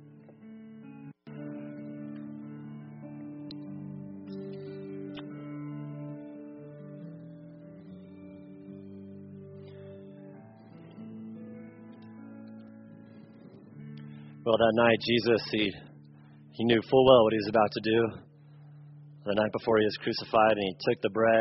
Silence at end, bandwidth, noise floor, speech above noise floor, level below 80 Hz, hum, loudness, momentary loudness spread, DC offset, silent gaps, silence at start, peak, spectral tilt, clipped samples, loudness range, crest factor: 0 s; 5.8 kHz; -53 dBFS; 28 dB; -66 dBFS; none; -27 LUFS; 24 LU; under 0.1%; none; 0 s; -8 dBFS; -4 dB/octave; under 0.1%; 22 LU; 24 dB